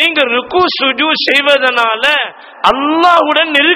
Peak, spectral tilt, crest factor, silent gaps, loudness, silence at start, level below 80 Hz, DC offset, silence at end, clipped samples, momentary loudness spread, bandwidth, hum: 0 dBFS; -2.5 dB/octave; 12 dB; none; -10 LUFS; 0 s; -48 dBFS; under 0.1%; 0 s; 0.7%; 4 LU; 19 kHz; none